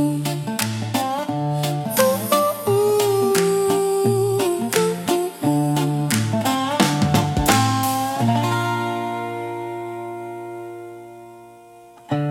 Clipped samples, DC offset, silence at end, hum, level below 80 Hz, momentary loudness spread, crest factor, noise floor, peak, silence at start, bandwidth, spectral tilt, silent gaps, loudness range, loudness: under 0.1%; under 0.1%; 0 s; none; -46 dBFS; 13 LU; 20 dB; -45 dBFS; 0 dBFS; 0 s; 17.5 kHz; -5 dB/octave; none; 8 LU; -20 LUFS